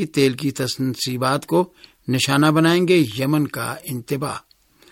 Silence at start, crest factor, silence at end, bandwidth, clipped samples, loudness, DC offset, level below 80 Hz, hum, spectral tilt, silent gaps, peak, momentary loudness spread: 0 s; 16 dB; 0.55 s; 17 kHz; under 0.1%; -20 LUFS; under 0.1%; -58 dBFS; none; -5 dB/octave; none; -4 dBFS; 13 LU